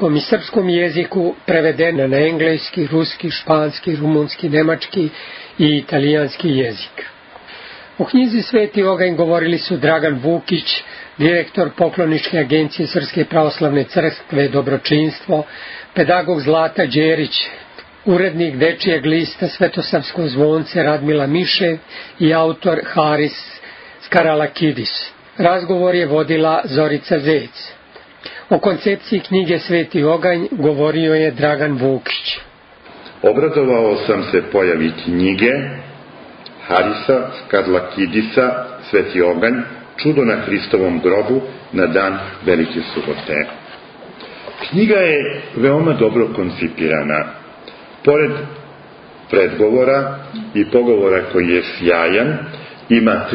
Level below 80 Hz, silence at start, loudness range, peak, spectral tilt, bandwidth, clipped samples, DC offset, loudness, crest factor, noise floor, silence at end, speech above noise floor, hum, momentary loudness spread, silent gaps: -54 dBFS; 0 s; 2 LU; 0 dBFS; -10 dB/octave; 5.8 kHz; under 0.1%; under 0.1%; -16 LUFS; 16 dB; -41 dBFS; 0 s; 26 dB; none; 13 LU; none